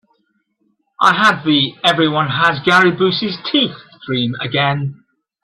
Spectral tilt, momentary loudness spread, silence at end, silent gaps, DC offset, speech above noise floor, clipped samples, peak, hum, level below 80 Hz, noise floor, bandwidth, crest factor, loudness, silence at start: -5 dB/octave; 9 LU; 0.5 s; none; under 0.1%; 50 dB; under 0.1%; 0 dBFS; none; -56 dBFS; -65 dBFS; 12.5 kHz; 16 dB; -15 LUFS; 1 s